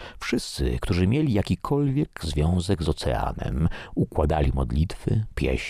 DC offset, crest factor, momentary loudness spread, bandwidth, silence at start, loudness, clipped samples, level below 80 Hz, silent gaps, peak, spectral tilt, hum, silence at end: under 0.1%; 16 dB; 5 LU; 15 kHz; 0 s; -25 LUFS; under 0.1%; -32 dBFS; none; -8 dBFS; -6.5 dB/octave; none; 0 s